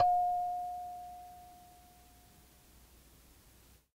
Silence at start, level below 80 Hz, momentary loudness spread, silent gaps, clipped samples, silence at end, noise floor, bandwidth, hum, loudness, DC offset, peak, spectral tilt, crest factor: 0 s; -64 dBFS; 28 LU; none; under 0.1%; 2.3 s; -63 dBFS; 16 kHz; none; -36 LUFS; under 0.1%; -18 dBFS; -4.5 dB/octave; 20 dB